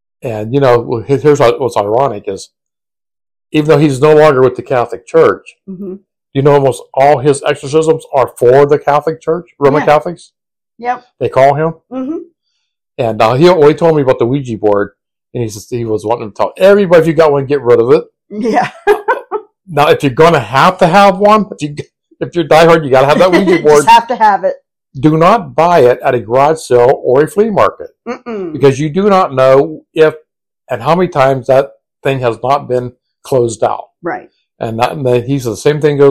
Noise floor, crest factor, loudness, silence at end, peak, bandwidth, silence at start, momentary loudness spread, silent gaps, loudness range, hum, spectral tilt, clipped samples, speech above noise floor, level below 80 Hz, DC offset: -90 dBFS; 10 dB; -10 LUFS; 0 s; 0 dBFS; 15 kHz; 0.25 s; 15 LU; none; 5 LU; none; -6 dB/octave; 3%; 80 dB; -44 dBFS; under 0.1%